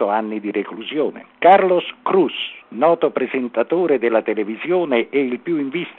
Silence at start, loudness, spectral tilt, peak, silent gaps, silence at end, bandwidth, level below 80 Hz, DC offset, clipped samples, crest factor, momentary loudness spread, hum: 0 s; -19 LUFS; -8.5 dB/octave; 0 dBFS; none; 0.05 s; 4.2 kHz; -72 dBFS; under 0.1%; under 0.1%; 18 dB; 11 LU; none